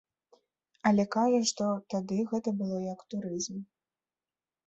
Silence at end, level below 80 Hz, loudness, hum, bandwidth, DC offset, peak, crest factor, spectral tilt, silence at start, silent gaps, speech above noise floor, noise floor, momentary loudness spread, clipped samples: 1.05 s; -72 dBFS; -31 LUFS; none; 8.4 kHz; under 0.1%; -12 dBFS; 20 dB; -5 dB/octave; 0.85 s; none; over 60 dB; under -90 dBFS; 11 LU; under 0.1%